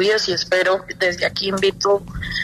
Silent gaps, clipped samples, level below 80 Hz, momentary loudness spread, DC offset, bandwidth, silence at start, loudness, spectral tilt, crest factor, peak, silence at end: none; under 0.1%; -42 dBFS; 4 LU; under 0.1%; 13.5 kHz; 0 s; -19 LUFS; -3.5 dB/octave; 14 dB; -6 dBFS; 0 s